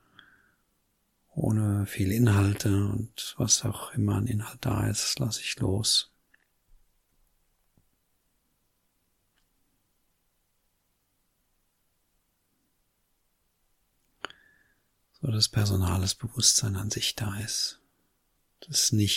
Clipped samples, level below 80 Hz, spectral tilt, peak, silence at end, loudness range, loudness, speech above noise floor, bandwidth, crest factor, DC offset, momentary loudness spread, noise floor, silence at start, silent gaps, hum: under 0.1%; -54 dBFS; -3.5 dB/octave; -8 dBFS; 0 s; 5 LU; -27 LUFS; 47 dB; 16.5 kHz; 24 dB; under 0.1%; 10 LU; -74 dBFS; 1.35 s; none; none